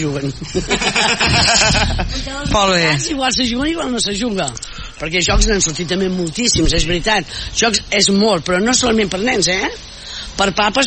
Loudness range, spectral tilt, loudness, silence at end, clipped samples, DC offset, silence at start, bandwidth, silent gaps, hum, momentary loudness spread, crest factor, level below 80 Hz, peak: 3 LU; -3 dB/octave; -15 LUFS; 0 s; under 0.1%; under 0.1%; 0 s; 8.8 kHz; none; none; 11 LU; 16 dB; -26 dBFS; 0 dBFS